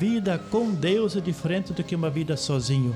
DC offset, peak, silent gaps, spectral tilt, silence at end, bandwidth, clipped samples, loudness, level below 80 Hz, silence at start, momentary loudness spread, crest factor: under 0.1%; -12 dBFS; none; -6 dB/octave; 0 s; 13 kHz; under 0.1%; -26 LUFS; -54 dBFS; 0 s; 4 LU; 12 dB